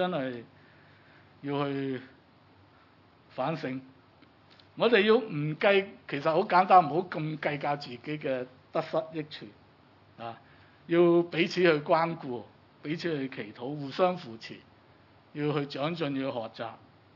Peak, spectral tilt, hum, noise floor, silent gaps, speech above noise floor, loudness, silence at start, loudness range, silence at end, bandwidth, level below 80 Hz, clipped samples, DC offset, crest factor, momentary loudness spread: -8 dBFS; -7 dB/octave; none; -60 dBFS; none; 31 dB; -29 LUFS; 0 s; 11 LU; 0.4 s; 6 kHz; -80 dBFS; under 0.1%; under 0.1%; 22 dB; 20 LU